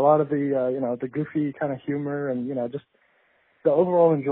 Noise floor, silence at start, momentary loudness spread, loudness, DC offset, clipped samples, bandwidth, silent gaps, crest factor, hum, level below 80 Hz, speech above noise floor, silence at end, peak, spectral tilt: -64 dBFS; 0 s; 10 LU; -24 LUFS; under 0.1%; under 0.1%; 4 kHz; none; 16 dB; none; -70 dBFS; 41 dB; 0 s; -8 dBFS; -8.5 dB/octave